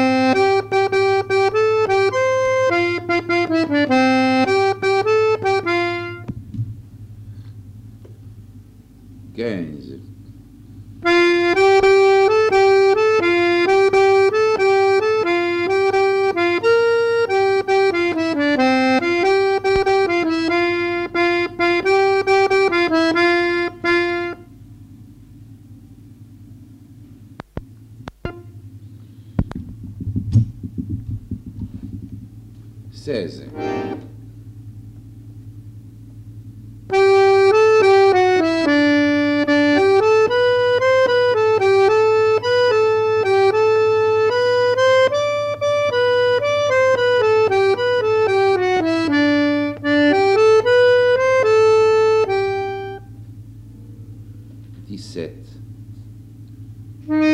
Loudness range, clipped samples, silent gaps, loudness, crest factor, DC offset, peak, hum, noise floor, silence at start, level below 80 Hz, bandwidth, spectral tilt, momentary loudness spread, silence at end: 18 LU; under 0.1%; none; -16 LUFS; 14 dB; under 0.1%; -2 dBFS; none; -43 dBFS; 0 s; -46 dBFS; 10.5 kHz; -5.5 dB/octave; 18 LU; 0 s